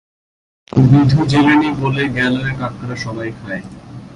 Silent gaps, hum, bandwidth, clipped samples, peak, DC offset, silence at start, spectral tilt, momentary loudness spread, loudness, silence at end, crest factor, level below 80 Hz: none; none; 10.5 kHz; under 0.1%; 0 dBFS; under 0.1%; 0.75 s; -7.5 dB/octave; 16 LU; -15 LUFS; 0 s; 16 dB; -42 dBFS